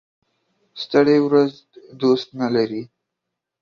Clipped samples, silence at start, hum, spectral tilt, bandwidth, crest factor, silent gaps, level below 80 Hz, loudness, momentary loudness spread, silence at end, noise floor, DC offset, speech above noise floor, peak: under 0.1%; 0.75 s; none; -7 dB/octave; 7 kHz; 18 dB; none; -66 dBFS; -19 LUFS; 10 LU; 0.75 s; -82 dBFS; under 0.1%; 63 dB; -2 dBFS